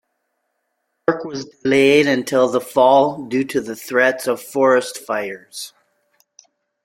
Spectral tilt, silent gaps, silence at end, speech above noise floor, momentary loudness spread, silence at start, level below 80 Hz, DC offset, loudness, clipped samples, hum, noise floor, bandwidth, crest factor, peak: -4.5 dB/octave; none; 1.15 s; 55 dB; 16 LU; 1.1 s; -64 dBFS; under 0.1%; -17 LUFS; under 0.1%; none; -73 dBFS; 16.5 kHz; 18 dB; -2 dBFS